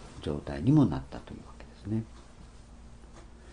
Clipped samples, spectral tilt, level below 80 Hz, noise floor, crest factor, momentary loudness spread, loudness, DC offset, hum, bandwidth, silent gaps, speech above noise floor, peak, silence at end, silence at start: under 0.1%; -8.5 dB/octave; -50 dBFS; -50 dBFS; 20 dB; 28 LU; -29 LUFS; under 0.1%; none; 10 kHz; none; 21 dB; -12 dBFS; 0 s; 0 s